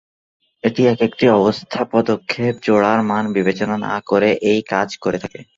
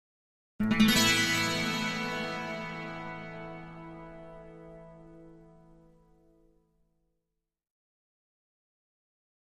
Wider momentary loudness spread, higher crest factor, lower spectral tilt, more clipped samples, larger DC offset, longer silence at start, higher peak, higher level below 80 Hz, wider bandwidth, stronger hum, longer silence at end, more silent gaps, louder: second, 8 LU vs 26 LU; second, 16 dB vs 22 dB; first, -6.5 dB/octave vs -3 dB/octave; neither; neither; about the same, 0.65 s vs 0.6 s; first, -2 dBFS vs -12 dBFS; about the same, -56 dBFS vs -56 dBFS; second, 7.6 kHz vs 15.5 kHz; neither; second, 0.15 s vs 4.05 s; neither; first, -17 LUFS vs -28 LUFS